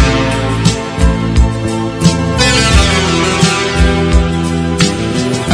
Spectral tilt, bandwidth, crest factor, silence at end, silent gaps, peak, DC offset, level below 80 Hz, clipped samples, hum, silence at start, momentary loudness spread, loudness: -4.5 dB/octave; 11 kHz; 12 dB; 0 s; none; 0 dBFS; under 0.1%; -18 dBFS; 0.3%; none; 0 s; 6 LU; -12 LUFS